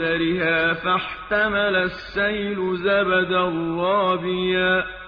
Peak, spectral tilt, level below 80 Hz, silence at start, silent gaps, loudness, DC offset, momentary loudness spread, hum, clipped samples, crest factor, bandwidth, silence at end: -8 dBFS; -7.5 dB/octave; -48 dBFS; 0 s; none; -21 LUFS; under 0.1%; 5 LU; none; under 0.1%; 14 dB; 5.4 kHz; 0 s